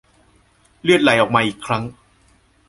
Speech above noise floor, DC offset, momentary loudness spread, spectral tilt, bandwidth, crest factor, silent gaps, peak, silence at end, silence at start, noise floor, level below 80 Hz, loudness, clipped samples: 39 dB; under 0.1%; 10 LU; -5 dB/octave; 11.5 kHz; 18 dB; none; -2 dBFS; 0.75 s; 0.85 s; -56 dBFS; -54 dBFS; -17 LUFS; under 0.1%